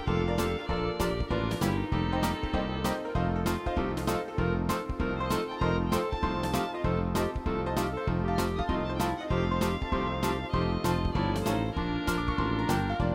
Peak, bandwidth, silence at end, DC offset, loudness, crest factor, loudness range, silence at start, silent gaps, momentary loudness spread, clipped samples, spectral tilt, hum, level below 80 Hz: -14 dBFS; 17 kHz; 0 s; under 0.1%; -30 LUFS; 14 dB; 1 LU; 0 s; none; 3 LU; under 0.1%; -6 dB/octave; none; -38 dBFS